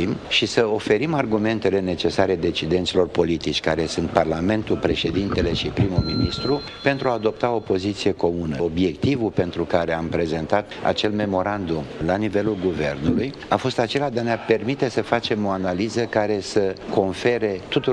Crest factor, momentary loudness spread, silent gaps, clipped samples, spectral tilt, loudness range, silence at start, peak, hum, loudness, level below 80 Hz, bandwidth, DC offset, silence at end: 18 dB; 3 LU; none; under 0.1%; -6 dB/octave; 2 LU; 0 s; -2 dBFS; none; -22 LUFS; -42 dBFS; 10.5 kHz; under 0.1%; 0 s